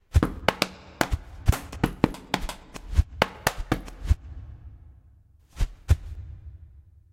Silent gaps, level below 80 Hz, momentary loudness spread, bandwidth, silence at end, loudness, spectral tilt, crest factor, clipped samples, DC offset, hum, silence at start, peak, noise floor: none; -32 dBFS; 18 LU; 16.5 kHz; 0.45 s; -28 LUFS; -5.5 dB/octave; 28 dB; under 0.1%; under 0.1%; none; 0.15 s; 0 dBFS; -56 dBFS